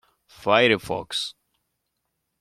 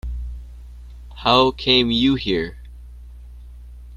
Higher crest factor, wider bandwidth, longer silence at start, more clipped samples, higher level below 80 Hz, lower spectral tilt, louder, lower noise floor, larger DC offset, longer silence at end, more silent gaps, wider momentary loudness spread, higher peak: about the same, 22 dB vs 22 dB; first, 14.5 kHz vs 11 kHz; first, 0.4 s vs 0.05 s; neither; second, -60 dBFS vs -36 dBFS; second, -4 dB/octave vs -6 dB/octave; second, -22 LUFS vs -17 LUFS; first, -78 dBFS vs -39 dBFS; neither; first, 1.1 s vs 0 s; neither; second, 13 LU vs 22 LU; second, -4 dBFS vs 0 dBFS